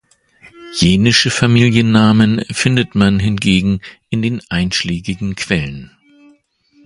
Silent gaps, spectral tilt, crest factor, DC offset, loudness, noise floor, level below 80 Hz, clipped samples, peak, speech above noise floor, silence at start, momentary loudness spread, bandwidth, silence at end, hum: none; -5 dB/octave; 14 dB; under 0.1%; -14 LUFS; -53 dBFS; -38 dBFS; under 0.1%; 0 dBFS; 40 dB; 0.6 s; 11 LU; 11.5 kHz; 1 s; none